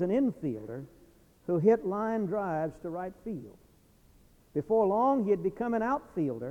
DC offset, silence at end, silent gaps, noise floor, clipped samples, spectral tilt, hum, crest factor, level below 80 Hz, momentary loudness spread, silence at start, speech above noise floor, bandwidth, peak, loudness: under 0.1%; 0 s; none; -61 dBFS; under 0.1%; -9.5 dB/octave; none; 18 dB; -62 dBFS; 15 LU; 0 s; 32 dB; 10 kHz; -12 dBFS; -30 LUFS